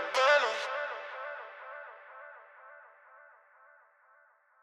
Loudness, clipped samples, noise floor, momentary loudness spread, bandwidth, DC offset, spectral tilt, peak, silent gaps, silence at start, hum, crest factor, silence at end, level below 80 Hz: -30 LUFS; under 0.1%; -65 dBFS; 28 LU; 12 kHz; under 0.1%; 1.5 dB/octave; -12 dBFS; none; 0 s; none; 24 dB; 1.35 s; under -90 dBFS